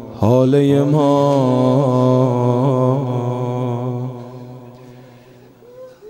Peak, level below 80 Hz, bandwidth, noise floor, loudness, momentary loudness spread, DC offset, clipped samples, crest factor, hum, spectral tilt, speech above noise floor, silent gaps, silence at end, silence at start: -2 dBFS; -56 dBFS; 9.2 kHz; -44 dBFS; -16 LUFS; 14 LU; under 0.1%; under 0.1%; 14 dB; none; -9 dB/octave; 30 dB; none; 0 s; 0 s